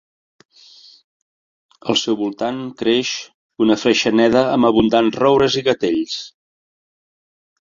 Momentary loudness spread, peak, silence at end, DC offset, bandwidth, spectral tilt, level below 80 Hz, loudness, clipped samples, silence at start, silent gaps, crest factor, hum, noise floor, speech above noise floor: 12 LU; -2 dBFS; 1.45 s; under 0.1%; 7.6 kHz; -4.5 dB/octave; -52 dBFS; -17 LUFS; under 0.1%; 1.85 s; 3.34-3.50 s; 18 dB; none; -46 dBFS; 30 dB